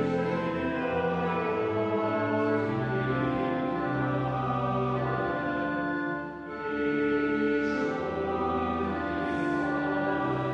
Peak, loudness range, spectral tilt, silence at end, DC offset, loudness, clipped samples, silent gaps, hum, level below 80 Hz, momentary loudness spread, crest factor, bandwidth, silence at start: -16 dBFS; 1 LU; -8 dB/octave; 0 s; under 0.1%; -29 LUFS; under 0.1%; none; none; -52 dBFS; 4 LU; 14 dB; 8 kHz; 0 s